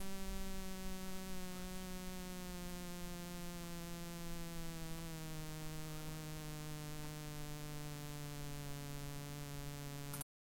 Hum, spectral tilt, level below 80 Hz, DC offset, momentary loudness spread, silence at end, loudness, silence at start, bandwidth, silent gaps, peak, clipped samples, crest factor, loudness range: none; -4.5 dB/octave; -52 dBFS; under 0.1%; 1 LU; 0.25 s; -48 LUFS; 0 s; 17 kHz; none; -26 dBFS; under 0.1%; 18 dB; 0 LU